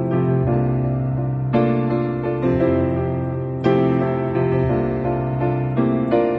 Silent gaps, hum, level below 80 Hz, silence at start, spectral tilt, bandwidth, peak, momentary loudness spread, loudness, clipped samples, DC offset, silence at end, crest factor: none; none; -40 dBFS; 0 s; -11 dB/octave; 4.5 kHz; -4 dBFS; 4 LU; -20 LUFS; under 0.1%; under 0.1%; 0 s; 14 dB